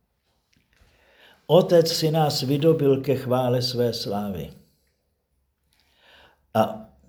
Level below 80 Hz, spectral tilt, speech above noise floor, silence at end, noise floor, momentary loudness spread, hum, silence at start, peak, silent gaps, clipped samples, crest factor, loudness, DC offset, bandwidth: -60 dBFS; -6 dB/octave; 51 dB; 0.25 s; -72 dBFS; 10 LU; none; 1.5 s; -4 dBFS; none; under 0.1%; 20 dB; -22 LUFS; under 0.1%; over 20 kHz